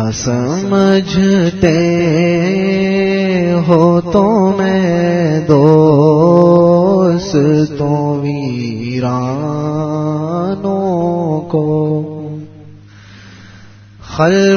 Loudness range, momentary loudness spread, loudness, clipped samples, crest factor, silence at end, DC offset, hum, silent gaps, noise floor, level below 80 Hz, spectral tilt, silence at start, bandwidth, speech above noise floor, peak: 8 LU; 9 LU; -12 LUFS; 0.1%; 12 dB; 0 s; under 0.1%; none; none; -38 dBFS; -42 dBFS; -7 dB/octave; 0 s; 6.8 kHz; 27 dB; 0 dBFS